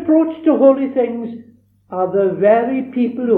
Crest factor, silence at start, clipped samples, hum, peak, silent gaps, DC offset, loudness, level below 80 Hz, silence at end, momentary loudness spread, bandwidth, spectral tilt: 16 dB; 0 s; under 0.1%; none; 0 dBFS; none; under 0.1%; -15 LUFS; -64 dBFS; 0 s; 15 LU; 4 kHz; -10.5 dB/octave